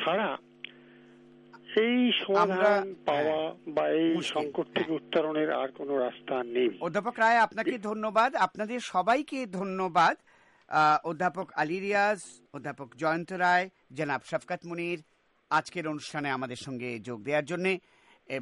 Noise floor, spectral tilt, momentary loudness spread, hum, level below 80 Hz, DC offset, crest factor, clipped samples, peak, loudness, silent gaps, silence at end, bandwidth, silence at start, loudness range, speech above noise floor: -55 dBFS; -5 dB/octave; 12 LU; none; -76 dBFS; under 0.1%; 18 dB; under 0.1%; -10 dBFS; -29 LUFS; none; 0 s; 11.5 kHz; 0 s; 5 LU; 26 dB